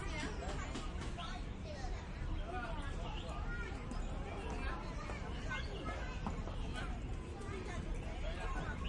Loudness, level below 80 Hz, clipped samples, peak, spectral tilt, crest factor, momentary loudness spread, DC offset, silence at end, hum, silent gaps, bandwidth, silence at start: -44 LUFS; -44 dBFS; under 0.1%; -28 dBFS; -5.5 dB/octave; 14 dB; 3 LU; under 0.1%; 0 s; none; none; 10.5 kHz; 0 s